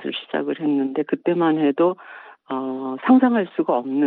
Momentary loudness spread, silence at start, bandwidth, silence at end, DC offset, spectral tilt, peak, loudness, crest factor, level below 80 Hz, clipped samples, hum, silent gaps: 12 LU; 0 s; 4.1 kHz; 0 s; under 0.1%; -9.5 dB/octave; -4 dBFS; -21 LUFS; 18 dB; -72 dBFS; under 0.1%; none; none